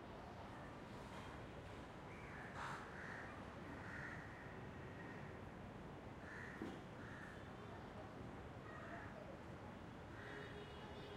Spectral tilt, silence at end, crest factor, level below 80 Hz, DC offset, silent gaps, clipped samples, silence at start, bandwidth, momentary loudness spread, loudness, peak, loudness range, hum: -6 dB/octave; 0 s; 20 dB; -66 dBFS; under 0.1%; none; under 0.1%; 0 s; 16 kHz; 4 LU; -54 LUFS; -34 dBFS; 2 LU; none